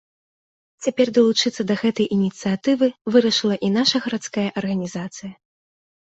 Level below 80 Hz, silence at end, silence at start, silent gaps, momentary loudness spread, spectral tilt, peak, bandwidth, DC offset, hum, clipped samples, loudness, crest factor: -62 dBFS; 0.8 s; 0.8 s; 3.01-3.05 s; 11 LU; -5 dB/octave; -4 dBFS; 8.2 kHz; under 0.1%; none; under 0.1%; -20 LUFS; 18 dB